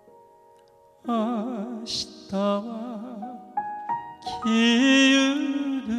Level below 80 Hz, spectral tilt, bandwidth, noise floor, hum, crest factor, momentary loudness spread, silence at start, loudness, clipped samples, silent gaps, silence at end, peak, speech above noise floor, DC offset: -64 dBFS; -3.5 dB/octave; 10.5 kHz; -56 dBFS; none; 16 dB; 18 LU; 1.05 s; -24 LUFS; under 0.1%; none; 0 s; -8 dBFS; 33 dB; under 0.1%